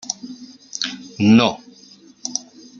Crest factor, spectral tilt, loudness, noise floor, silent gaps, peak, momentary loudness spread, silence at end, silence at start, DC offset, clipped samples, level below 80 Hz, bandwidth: 20 dB; -4.5 dB/octave; -19 LUFS; -47 dBFS; none; -2 dBFS; 23 LU; 0.4 s; 0.05 s; under 0.1%; under 0.1%; -62 dBFS; 7.4 kHz